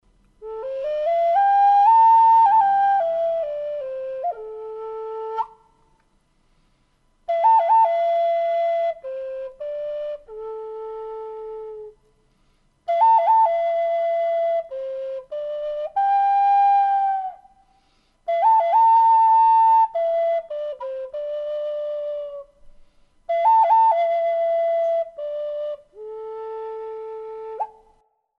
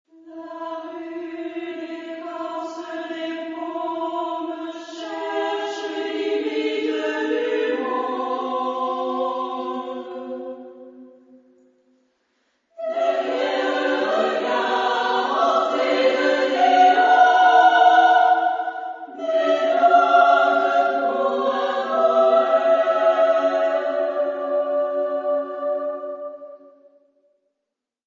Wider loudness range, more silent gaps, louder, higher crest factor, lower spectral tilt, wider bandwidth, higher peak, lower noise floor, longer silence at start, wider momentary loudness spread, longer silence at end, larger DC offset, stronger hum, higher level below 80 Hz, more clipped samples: about the same, 14 LU vs 14 LU; neither; about the same, -19 LUFS vs -20 LUFS; about the same, 14 dB vs 18 dB; about the same, -3 dB/octave vs -3 dB/octave; second, 5.8 kHz vs 7.6 kHz; second, -8 dBFS vs -2 dBFS; second, -63 dBFS vs -82 dBFS; first, 0.4 s vs 0.25 s; about the same, 19 LU vs 18 LU; second, 0.7 s vs 1.5 s; neither; neither; first, -62 dBFS vs -78 dBFS; neither